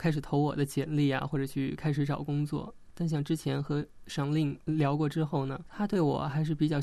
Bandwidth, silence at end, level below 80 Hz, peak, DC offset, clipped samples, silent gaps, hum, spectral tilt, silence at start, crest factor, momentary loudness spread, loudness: 13.5 kHz; 0 s; -56 dBFS; -16 dBFS; under 0.1%; under 0.1%; none; none; -7.5 dB/octave; 0 s; 14 dB; 6 LU; -31 LUFS